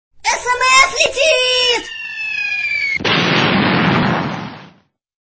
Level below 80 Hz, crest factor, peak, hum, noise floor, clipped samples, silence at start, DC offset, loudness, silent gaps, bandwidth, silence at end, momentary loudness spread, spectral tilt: -46 dBFS; 16 dB; 0 dBFS; none; -50 dBFS; under 0.1%; 0.25 s; under 0.1%; -14 LUFS; none; 8 kHz; 0.6 s; 12 LU; -3 dB/octave